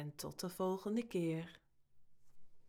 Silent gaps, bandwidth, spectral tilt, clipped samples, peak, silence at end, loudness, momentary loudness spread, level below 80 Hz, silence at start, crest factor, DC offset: none; 19.5 kHz; -6 dB/octave; under 0.1%; -26 dBFS; 0 s; -41 LUFS; 8 LU; -72 dBFS; 0 s; 16 dB; under 0.1%